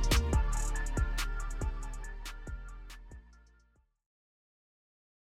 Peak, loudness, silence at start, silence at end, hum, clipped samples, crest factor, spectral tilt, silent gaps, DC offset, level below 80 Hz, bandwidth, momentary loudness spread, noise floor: -16 dBFS; -36 LUFS; 0 s; 1.95 s; none; under 0.1%; 20 dB; -4 dB/octave; none; under 0.1%; -36 dBFS; 16 kHz; 20 LU; -69 dBFS